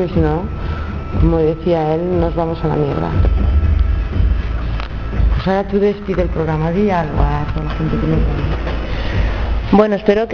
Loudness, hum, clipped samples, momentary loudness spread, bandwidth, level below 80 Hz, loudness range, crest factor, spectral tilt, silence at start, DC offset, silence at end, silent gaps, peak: -17 LUFS; none; under 0.1%; 8 LU; 6.4 kHz; -20 dBFS; 2 LU; 16 dB; -9 dB/octave; 0 s; under 0.1%; 0 s; none; 0 dBFS